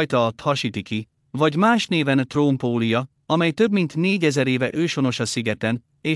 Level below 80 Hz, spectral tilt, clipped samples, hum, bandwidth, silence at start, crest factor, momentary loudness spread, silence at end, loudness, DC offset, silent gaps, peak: -64 dBFS; -5.5 dB/octave; under 0.1%; none; 12 kHz; 0 s; 16 dB; 7 LU; 0 s; -21 LUFS; under 0.1%; none; -4 dBFS